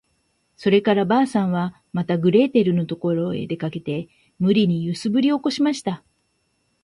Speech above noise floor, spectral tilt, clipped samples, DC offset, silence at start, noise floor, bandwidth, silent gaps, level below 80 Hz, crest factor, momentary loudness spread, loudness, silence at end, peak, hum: 49 dB; -7 dB/octave; under 0.1%; under 0.1%; 0.6 s; -69 dBFS; 11.5 kHz; none; -62 dBFS; 16 dB; 11 LU; -21 LUFS; 0.85 s; -4 dBFS; none